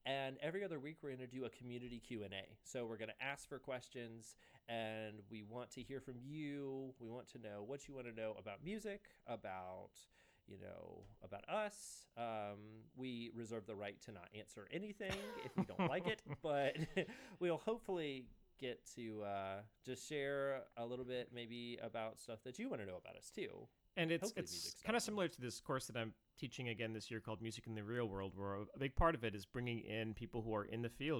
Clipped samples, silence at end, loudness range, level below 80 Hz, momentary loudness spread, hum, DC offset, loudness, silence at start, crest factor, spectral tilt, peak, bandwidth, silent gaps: under 0.1%; 0 s; 7 LU; -62 dBFS; 13 LU; none; under 0.1%; -47 LUFS; 0.05 s; 24 dB; -5 dB/octave; -22 dBFS; over 20 kHz; none